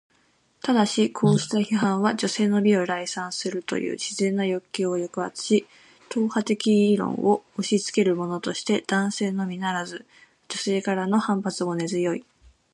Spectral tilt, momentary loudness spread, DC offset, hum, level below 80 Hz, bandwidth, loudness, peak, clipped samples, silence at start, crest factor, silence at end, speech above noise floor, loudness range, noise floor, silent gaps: -5 dB/octave; 8 LU; under 0.1%; none; -68 dBFS; 11.5 kHz; -24 LUFS; -8 dBFS; under 0.1%; 0.65 s; 16 dB; 0.5 s; 41 dB; 4 LU; -64 dBFS; none